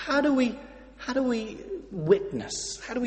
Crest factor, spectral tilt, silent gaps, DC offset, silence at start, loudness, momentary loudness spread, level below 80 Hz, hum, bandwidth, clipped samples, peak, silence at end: 20 dB; -4.5 dB/octave; none; under 0.1%; 0 s; -28 LUFS; 15 LU; -54 dBFS; none; 8.8 kHz; under 0.1%; -8 dBFS; 0 s